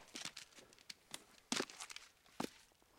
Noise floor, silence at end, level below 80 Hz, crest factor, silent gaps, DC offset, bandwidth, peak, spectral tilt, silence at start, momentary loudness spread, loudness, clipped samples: -67 dBFS; 0 s; -82 dBFS; 30 dB; none; under 0.1%; 16.5 kHz; -20 dBFS; -1.5 dB/octave; 0 s; 18 LU; -48 LUFS; under 0.1%